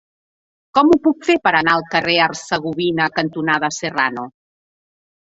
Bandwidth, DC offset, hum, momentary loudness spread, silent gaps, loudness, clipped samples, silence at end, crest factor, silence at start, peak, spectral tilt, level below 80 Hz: 8 kHz; under 0.1%; none; 7 LU; none; -17 LUFS; under 0.1%; 0.9 s; 18 dB; 0.75 s; -2 dBFS; -4 dB/octave; -56 dBFS